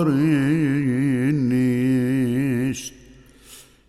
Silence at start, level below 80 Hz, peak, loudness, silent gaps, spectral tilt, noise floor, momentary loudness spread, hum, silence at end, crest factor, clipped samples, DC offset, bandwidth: 0 s; -52 dBFS; -8 dBFS; -21 LUFS; none; -7 dB/octave; -48 dBFS; 6 LU; none; 0.25 s; 14 dB; under 0.1%; under 0.1%; 14 kHz